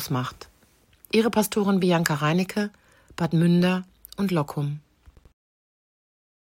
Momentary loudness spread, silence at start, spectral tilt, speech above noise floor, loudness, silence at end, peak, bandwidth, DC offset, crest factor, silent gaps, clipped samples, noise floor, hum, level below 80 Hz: 12 LU; 0 s; -6 dB/octave; 37 dB; -24 LUFS; 1.75 s; -2 dBFS; 16.5 kHz; under 0.1%; 24 dB; none; under 0.1%; -60 dBFS; none; -60 dBFS